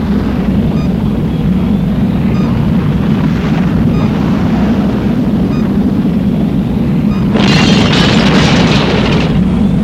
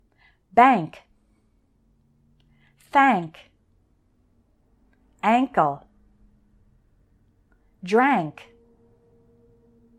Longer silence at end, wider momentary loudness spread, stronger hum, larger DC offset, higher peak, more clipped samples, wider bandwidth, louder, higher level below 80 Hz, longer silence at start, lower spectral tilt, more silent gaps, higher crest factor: second, 0 s vs 1.65 s; second, 5 LU vs 20 LU; neither; first, 0.4% vs under 0.1%; first, 0 dBFS vs -4 dBFS; first, 0.1% vs under 0.1%; about the same, 12.5 kHz vs 12 kHz; first, -11 LUFS vs -21 LUFS; first, -24 dBFS vs -62 dBFS; second, 0 s vs 0.55 s; about the same, -6.5 dB/octave vs -6.5 dB/octave; neither; second, 10 dB vs 22 dB